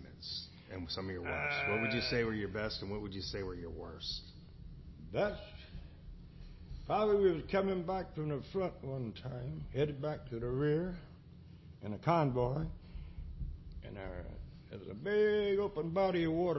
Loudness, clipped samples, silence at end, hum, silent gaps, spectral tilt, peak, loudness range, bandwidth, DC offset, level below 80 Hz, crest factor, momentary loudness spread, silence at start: -36 LUFS; under 0.1%; 0 s; none; none; -5 dB/octave; -18 dBFS; 6 LU; 6 kHz; under 0.1%; -52 dBFS; 18 dB; 21 LU; 0 s